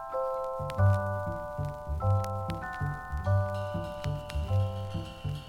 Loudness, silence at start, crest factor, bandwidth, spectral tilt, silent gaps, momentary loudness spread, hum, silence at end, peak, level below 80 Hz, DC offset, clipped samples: -32 LUFS; 0 s; 16 dB; 11.5 kHz; -7.5 dB/octave; none; 9 LU; none; 0 s; -16 dBFS; -42 dBFS; under 0.1%; under 0.1%